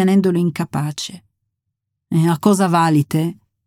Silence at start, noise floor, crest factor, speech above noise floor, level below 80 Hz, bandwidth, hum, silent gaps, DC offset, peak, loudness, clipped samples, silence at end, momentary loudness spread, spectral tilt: 0 s; -78 dBFS; 14 dB; 61 dB; -60 dBFS; 16 kHz; none; none; under 0.1%; -4 dBFS; -17 LUFS; under 0.1%; 0.35 s; 10 LU; -6.5 dB/octave